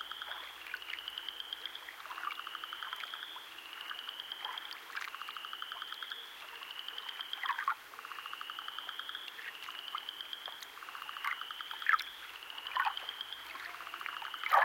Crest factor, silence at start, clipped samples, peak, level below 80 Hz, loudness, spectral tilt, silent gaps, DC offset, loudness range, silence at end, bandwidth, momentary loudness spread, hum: 28 dB; 0 s; under 0.1%; -14 dBFS; -82 dBFS; -40 LUFS; 1 dB/octave; none; under 0.1%; 5 LU; 0 s; 17 kHz; 10 LU; none